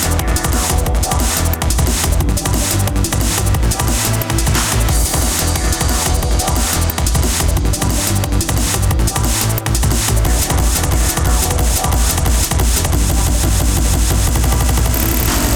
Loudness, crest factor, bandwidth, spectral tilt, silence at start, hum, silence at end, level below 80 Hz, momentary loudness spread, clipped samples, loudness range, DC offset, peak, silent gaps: -15 LUFS; 14 dB; over 20 kHz; -4 dB/octave; 0 s; none; 0 s; -18 dBFS; 1 LU; under 0.1%; 1 LU; under 0.1%; 0 dBFS; none